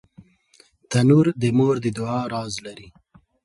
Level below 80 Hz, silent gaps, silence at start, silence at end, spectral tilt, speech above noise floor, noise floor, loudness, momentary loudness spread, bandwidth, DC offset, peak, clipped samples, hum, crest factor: -58 dBFS; none; 0.9 s; 0.65 s; -7 dB/octave; 37 dB; -57 dBFS; -21 LUFS; 15 LU; 11.5 kHz; under 0.1%; -4 dBFS; under 0.1%; none; 18 dB